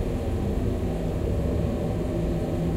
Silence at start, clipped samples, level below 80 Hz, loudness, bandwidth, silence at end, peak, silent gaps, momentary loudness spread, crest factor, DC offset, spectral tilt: 0 s; under 0.1%; -32 dBFS; -27 LUFS; 16 kHz; 0 s; -14 dBFS; none; 2 LU; 12 dB; under 0.1%; -8.5 dB/octave